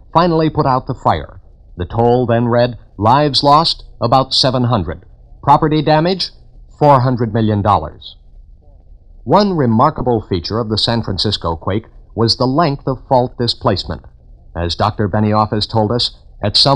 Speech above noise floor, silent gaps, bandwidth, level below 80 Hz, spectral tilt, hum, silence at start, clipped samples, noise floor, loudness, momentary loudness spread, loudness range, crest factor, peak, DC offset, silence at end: 27 dB; none; 10 kHz; -36 dBFS; -6.5 dB/octave; none; 0.15 s; under 0.1%; -41 dBFS; -14 LUFS; 12 LU; 4 LU; 14 dB; 0 dBFS; under 0.1%; 0 s